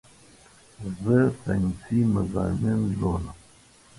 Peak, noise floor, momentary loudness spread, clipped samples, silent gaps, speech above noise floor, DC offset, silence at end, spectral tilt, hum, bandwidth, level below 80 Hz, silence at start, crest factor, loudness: -10 dBFS; -55 dBFS; 12 LU; under 0.1%; none; 30 dB; under 0.1%; 0.65 s; -8.5 dB/octave; none; 11.5 kHz; -42 dBFS; 0.8 s; 16 dB; -25 LUFS